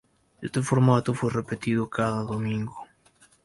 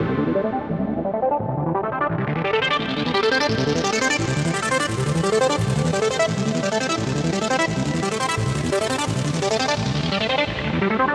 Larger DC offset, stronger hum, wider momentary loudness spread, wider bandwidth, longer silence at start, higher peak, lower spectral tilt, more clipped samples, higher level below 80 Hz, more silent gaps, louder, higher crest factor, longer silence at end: neither; neither; first, 13 LU vs 4 LU; second, 11.5 kHz vs 13.5 kHz; first, 0.4 s vs 0 s; about the same, -8 dBFS vs -6 dBFS; first, -7 dB/octave vs -4.5 dB/octave; neither; second, -56 dBFS vs -44 dBFS; neither; second, -26 LUFS vs -21 LUFS; first, 20 dB vs 14 dB; first, 0.6 s vs 0 s